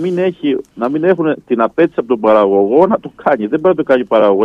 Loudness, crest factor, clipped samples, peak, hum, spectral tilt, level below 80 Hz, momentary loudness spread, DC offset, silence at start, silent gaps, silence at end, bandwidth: -13 LUFS; 12 dB; under 0.1%; 0 dBFS; none; -8.5 dB/octave; -56 dBFS; 6 LU; under 0.1%; 0 s; none; 0 s; 5.8 kHz